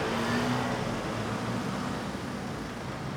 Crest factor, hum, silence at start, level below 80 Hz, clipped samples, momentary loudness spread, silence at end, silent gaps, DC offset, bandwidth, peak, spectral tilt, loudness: 14 dB; none; 0 s; -52 dBFS; under 0.1%; 8 LU; 0 s; none; under 0.1%; 19.5 kHz; -18 dBFS; -5.5 dB/octave; -32 LUFS